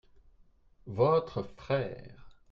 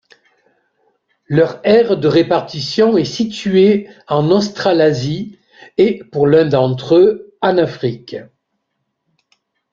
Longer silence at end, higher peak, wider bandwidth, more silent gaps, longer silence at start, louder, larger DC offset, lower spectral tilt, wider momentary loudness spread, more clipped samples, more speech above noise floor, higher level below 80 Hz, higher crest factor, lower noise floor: second, 0.2 s vs 1.5 s; second, -14 dBFS vs 0 dBFS; second, 6.8 kHz vs 7.6 kHz; neither; second, 0.85 s vs 1.3 s; second, -31 LUFS vs -14 LUFS; neither; first, -8.5 dB/octave vs -6.5 dB/octave; first, 15 LU vs 11 LU; neither; second, 31 dB vs 58 dB; second, -60 dBFS vs -54 dBFS; first, 20 dB vs 14 dB; second, -62 dBFS vs -72 dBFS